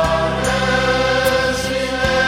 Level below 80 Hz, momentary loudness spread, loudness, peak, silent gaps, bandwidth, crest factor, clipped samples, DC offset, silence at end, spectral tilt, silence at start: -32 dBFS; 3 LU; -17 LUFS; -4 dBFS; none; 16.5 kHz; 14 dB; under 0.1%; under 0.1%; 0 s; -4 dB/octave; 0 s